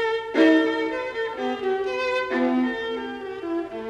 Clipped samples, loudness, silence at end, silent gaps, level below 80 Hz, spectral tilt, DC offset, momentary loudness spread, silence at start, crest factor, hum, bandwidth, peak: under 0.1%; -24 LUFS; 0 s; none; -60 dBFS; -4.5 dB/octave; under 0.1%; 11 LU; 0 s; 18 dB; none; 8.6 kHz; -6 dBFS